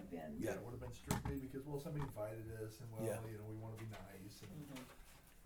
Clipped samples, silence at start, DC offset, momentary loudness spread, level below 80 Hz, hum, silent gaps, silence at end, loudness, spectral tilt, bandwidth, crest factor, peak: under 0.1%; 0 s; under 0.1%; 11 LU; -62 dBFS; none; none; 0 s; -48 LUFS; -6 dB/octave; over 20 kHz; 22 dB; -24 dBFS